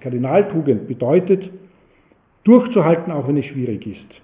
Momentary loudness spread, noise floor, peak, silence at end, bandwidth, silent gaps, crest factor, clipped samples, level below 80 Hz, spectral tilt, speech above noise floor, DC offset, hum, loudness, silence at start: 12 LU; -56 dBFS; 0 dBFS; 0.25 s; 3.8 kHz; none; 18 dB; under 0.1%; -58 dBFS; -12.5 dB/octave; 39 dB; under 0.1%; none; -17 LUFS; 0.05 s